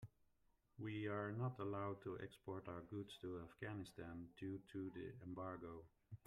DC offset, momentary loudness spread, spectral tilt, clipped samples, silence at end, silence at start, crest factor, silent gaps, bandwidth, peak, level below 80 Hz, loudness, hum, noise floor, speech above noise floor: under 0.1%; 9 LU; -7.5 dB/octave; under 0.1%; 0.1 s; 0 s; 16 dB; none; 13.5 kHz; -34 dBFS; -76 dBFS; -51 LUFS; none; -80 dBFS; 30 dB